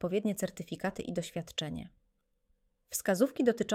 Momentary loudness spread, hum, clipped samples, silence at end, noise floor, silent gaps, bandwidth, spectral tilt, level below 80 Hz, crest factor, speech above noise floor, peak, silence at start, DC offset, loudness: 11 LU; none; under 0.1%; 0 s; -76 dBFS; none; 17.5 kHz; -4.5 dB/octave; -64 dBFS; 20 dB; 43 dB; -14 dBFS; 0 s; under 0.1%; -34 LUFS